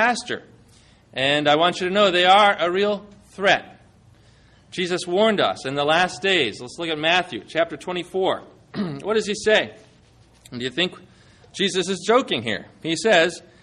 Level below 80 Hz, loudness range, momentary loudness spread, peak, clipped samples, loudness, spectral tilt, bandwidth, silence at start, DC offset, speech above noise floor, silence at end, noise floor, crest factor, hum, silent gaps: -60 dBFS; 6 LU; 13 LU; -4 dBFS; under 0.1%; -21 LUFS; -3.5 dB/octave; 11.5 kHz; 0 s; under 0.1%; 33 dB; 0.25 s; -53 dBFS; 18 dB; none; none